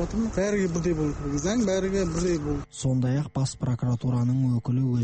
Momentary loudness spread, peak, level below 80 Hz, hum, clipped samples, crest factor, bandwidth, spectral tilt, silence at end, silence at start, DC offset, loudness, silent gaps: 4 LU; -14 dBFS; -42 dBFS; none; under 0.1%; 10 dB; 8.8 kHz; -6.5 dB/octave; 0 s; 0 s; under 0.1%; -26 LUFS; none